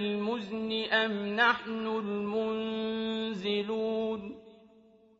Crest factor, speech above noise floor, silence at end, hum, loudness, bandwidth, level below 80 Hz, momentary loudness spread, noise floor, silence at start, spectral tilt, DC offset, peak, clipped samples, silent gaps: 20 dB; 29 dB; 0.65 s; none; -31 LUFS; 7.6 kHz; -70 dBFS; 8 LU; -60 dBFS; 0 s; -2 dB/octave; under 0.1%; -12 dBFS; under 0.1%; none